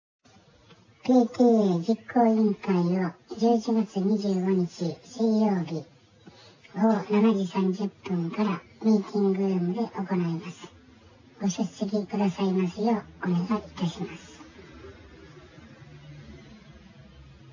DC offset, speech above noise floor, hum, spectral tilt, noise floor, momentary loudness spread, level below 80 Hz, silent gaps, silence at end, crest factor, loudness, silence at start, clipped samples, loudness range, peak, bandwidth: under 0.1%; 32 dB; none; -7.5 dB/octave; -57 dBFS; 19 LU; -62 dBFS; none; 0.3 s; 18 dB; -26 LUFS; 1.05 s; under 0.1%; 7 LU; -10 dBFS; 7.4 kHz